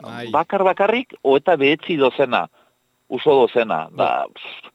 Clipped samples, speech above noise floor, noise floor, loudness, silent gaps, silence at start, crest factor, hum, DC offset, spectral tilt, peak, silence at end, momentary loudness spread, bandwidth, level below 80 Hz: under 0.1%; 44 dB; -62 dBFS; -18 LUFS; none; 0.05 s; 18 dB; none; under 0.1%; -6.5 dB/octave; -2 dBFS; 0.05 s; 9 LU; 7.8 kHz; -66 dBFS